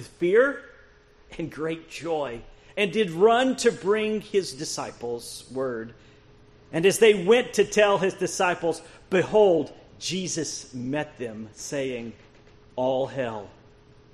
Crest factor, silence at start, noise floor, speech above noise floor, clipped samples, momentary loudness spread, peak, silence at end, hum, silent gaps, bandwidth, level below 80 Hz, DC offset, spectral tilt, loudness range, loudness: 20 dB; 0 s; -54 dBFS; 30 dB; under 0.1%; 17 LU; -6 dBFS; 0.65 s; none; none; 13 kHz; -58 dBFS; under 0.1%; -4 dB/octave; 9 LU; -24 LUFS